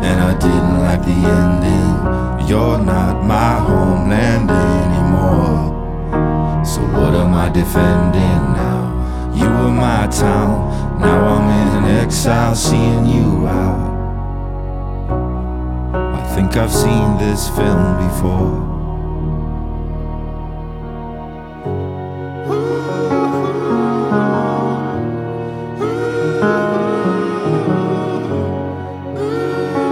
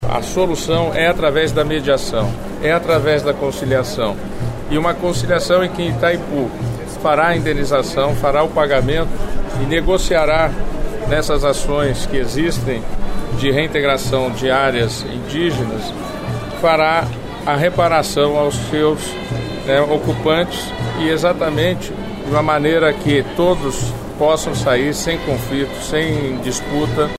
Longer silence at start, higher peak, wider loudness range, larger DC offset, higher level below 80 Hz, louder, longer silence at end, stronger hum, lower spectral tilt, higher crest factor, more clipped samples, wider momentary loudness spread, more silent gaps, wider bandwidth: about the same, 0 s vs 0 s; about the same, -2 dBFS vs -2 dBFS; first, 7 LU vs 2 LU; neither; about the same, -24 dBFS vs -28 dBFS; about the same, -16 LUFS vs -17 LUFS; about the same, 0 s vs 0 s; neither; first, -6.5 dB/octave vs -5 dB/octave; about the same, 14 dB vs 14 dB; neither; about the same, 11 LU vs 9 LU; neither; about the same, 16.5 kHz vs 15.5 kHz